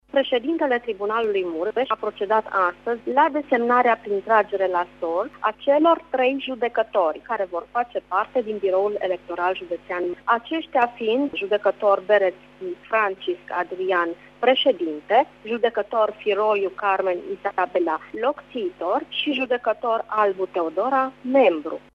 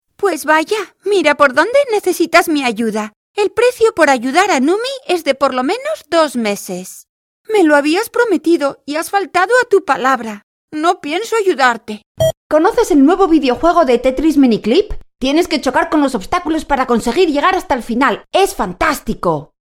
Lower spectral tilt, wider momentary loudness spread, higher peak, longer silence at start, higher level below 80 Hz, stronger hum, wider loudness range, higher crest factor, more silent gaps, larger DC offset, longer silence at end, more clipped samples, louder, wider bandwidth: first, -5.5 dB/octave vs -4 dB/octave; about the same, 8 LU vs 8 LU; second, -4 dBFS vs 0 dBFS; about the same, 0.15 s vs 0.2 s; second, -62 dBFS vs -38 dBFS; first, 50 Hz at -60 dBFS vs none; about the same, 3 LU vs 3 LU; about the same, 18 dB vs 14 dB; second, none vs 3.16-3.34 s, 7.09-7.45 s, 10.43-10.68 s, 12.06-12.15 s, 12.37-12.50 s; neither; about the same, 0.15 s vs 0.25 s; neither; second, -22 LUFS vs -14 LUFS; second, 6.4 kHz vs 16.5 kHz